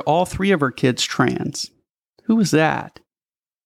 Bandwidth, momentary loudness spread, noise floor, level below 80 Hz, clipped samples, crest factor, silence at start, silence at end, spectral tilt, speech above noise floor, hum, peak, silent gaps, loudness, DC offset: 15 kHz; 13 LU; under -90 dBFS; -48 dBFS; under 0.1%; 16 dB; 0 s; 0.8 s; -5 dB/octave; over 71 dB; none; -4 dBFS; none; -19 LUFS; under 0.1%